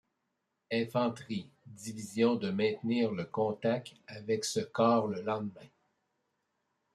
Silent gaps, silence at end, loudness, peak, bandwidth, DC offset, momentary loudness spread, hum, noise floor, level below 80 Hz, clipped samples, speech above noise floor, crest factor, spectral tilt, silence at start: none; 1.3 s; -32 LUFS; -14 dBFS; 13.5 kHz; under 0.1%; 14 LU; none; -83 dBFS; -78 dBFS; under 0.1%; 51 dB; 20 dB; -5.5 dB/octave; 0.7 s